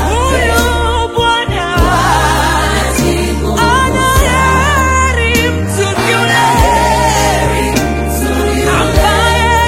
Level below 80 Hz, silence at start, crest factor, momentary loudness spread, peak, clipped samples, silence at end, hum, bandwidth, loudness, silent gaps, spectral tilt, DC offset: -18 dBFS; 0 s; 10 dB; 4 LU; 0 dBFS; under 0.1%; 0 s; none; 16.5 kHz; -11 LUFS; none; -4 dB/octave; under 0.1%